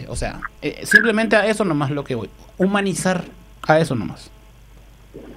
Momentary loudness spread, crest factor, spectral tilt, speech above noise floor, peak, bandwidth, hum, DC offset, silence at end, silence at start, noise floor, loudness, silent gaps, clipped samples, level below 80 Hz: 15 LU; 20 dB; -5 dB/octave; 26 dB; 0 dBFS; 16 kHz; none; under 0.1%; 0 s; 0 s; -45 dBFS; -19 LUFS; none; under 0.1%; -42 dBFS